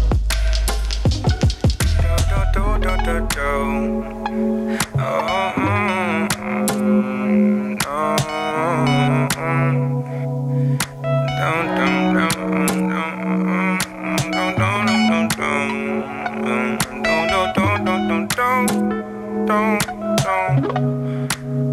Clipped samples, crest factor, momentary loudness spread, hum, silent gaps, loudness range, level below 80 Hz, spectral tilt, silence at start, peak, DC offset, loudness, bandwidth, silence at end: under 0.1%; 18 dB; 5 LU; none; none; 2 LU; -28 dBFS; -5.5 dB/octave; 0 s; 0 dBFS; under 0.1%; -19 LUFS; 16 kHz; 0 s